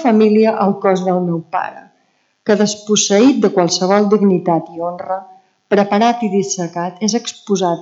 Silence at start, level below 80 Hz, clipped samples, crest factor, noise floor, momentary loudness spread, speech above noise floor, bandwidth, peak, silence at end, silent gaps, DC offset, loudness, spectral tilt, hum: 0 s; -68 dBFS; under 0.1%; 14 dB; -61 dBFS; 11 LU; 47 dB; 8 kHz; 0 dBFS; 0 s; none; under 0.1%; -15 LUFS; -4.5 dB/octave; none